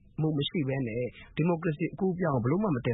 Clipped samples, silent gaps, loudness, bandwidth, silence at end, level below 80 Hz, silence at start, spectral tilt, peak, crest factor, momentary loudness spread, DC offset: under 0.1%; none; -30 LUFS; 4 kHz; 0 s; -56 dBFS; 0.2 s; -11.5 dB/octave; -16 dBFS; 14 dB; 5 LU; under 0.1%